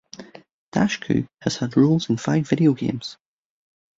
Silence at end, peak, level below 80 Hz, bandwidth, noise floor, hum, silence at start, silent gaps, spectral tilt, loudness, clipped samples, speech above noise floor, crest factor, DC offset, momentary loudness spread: 0.85 s; -4 dBFS; -56 dBFS; 7.8 kHz; -43 dBFS; none; 0.2 s; 0.53-0.72 s; -6.5 dB/octave; -22 LUFS; under 0.1%; 22 dB; 20 dB; under 0.1%; 14 LU